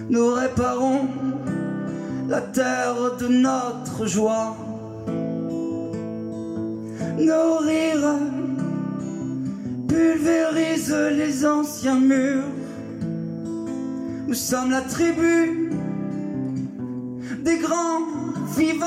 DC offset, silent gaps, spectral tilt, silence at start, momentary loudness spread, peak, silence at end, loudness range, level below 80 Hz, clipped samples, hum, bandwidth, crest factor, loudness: under 0.1%; none; -5.5 dB/octave; 0 s; 11 LU; -10 dBFS; 0 s; 4 LU; -54 dBFS; under 0.1%; none; 15.5 kHz; 14 dB; -23 LUFS